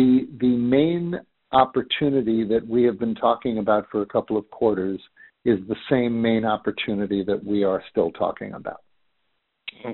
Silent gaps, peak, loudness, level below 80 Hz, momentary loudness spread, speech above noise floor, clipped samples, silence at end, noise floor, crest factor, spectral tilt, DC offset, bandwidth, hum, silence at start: none; -2 dBFS; -23 LUFS; -56 dBFS; 11 LU; 52 dB; under 0.1%; 0 s; -74 dBFS; 20 dB; -5 dB/octave; under 0.1%; 4.2 kHz; none; 0 s